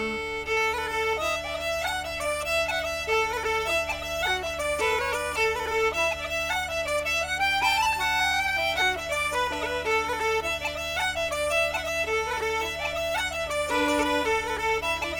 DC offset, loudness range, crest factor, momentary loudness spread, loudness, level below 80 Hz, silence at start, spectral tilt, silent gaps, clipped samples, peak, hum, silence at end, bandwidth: under 0.1%; 2 LU; 16 dB; 5 LU; -26 LUFS; -46 dBFS; 0 s; -2 dB/octave; none; under 0.1%; -12 dBFS; none; 0 s; 18 kHz